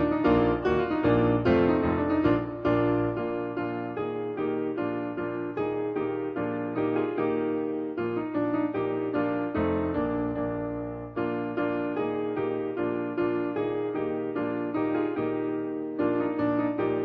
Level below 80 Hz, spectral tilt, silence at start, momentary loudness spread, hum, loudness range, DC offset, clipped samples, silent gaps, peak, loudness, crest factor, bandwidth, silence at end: -50 dBFS; -10 dB/octave; 0 s; 8 LU; none; 5 LU; under 0.1%; under 0.1%; none; -12 dBFS; -28 LUFS; 16 dB; 5.2 kHz; 0 s